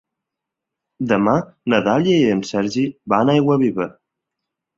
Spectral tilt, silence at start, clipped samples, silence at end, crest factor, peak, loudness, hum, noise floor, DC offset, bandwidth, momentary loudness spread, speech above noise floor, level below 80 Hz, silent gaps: -6.5 dB/octave; 1 s; under 0.1%; 0.9 s; 18 dB; 0 dBFS; -18 LUFS; none; -83 dBFS; under 0.1%; 7.8 kHz; 7 LU; 66 dB; -56 dBFS; none